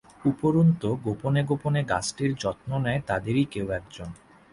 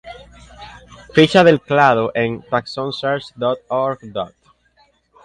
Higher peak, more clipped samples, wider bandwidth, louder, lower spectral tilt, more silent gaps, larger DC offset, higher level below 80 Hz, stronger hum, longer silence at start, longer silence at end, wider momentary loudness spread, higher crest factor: second, -10 dBFS vs 0 dBFS; neither; about the same, 11.5 kHz vs 11 kHz; second, -26 LUFS vs -17 LUFS; about the same, -6.5 dB/octave vs -6 dB/octave; neither; neither; about the same, -52 dBFS vs -52 dBFS; neither; first, 0.25 s vs 0.05 s; second, 0.4 s vs 0.95 s; second, 10 LU vs 17 LU; about the same, 16 dB vs 18 dB